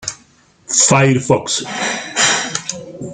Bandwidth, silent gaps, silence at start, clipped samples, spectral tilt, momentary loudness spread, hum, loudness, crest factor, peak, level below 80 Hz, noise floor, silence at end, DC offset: 9.6 kHz; none; 0 s; under 0.1%; -3 dB/octave; 15 LU; none; -14 LUFS; 18 dB; 0 dBFS; -54 dBFS; -51 dBFS; 0 s; under 0.1%